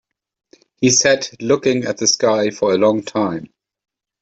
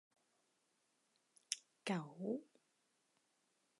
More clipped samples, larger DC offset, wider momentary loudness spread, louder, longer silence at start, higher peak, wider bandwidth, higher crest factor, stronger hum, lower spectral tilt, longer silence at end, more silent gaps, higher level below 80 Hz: neither; neither; first, 8 LU vs 3 LU; first, -16 LUFS vs -46 LUFS; second, 0.8 s vs 1.5 s; first, 0 dBFS vs -20 dBFS; second, 8.4 kHz vs 11 kHz; second, 18 dB vs 32 dB; neither; about the same, -3 dB/octave vs -4 dB/octave; second, 0.75 s vs 1.35 s; neither; first, -58 dBFS vs under -90 dBFS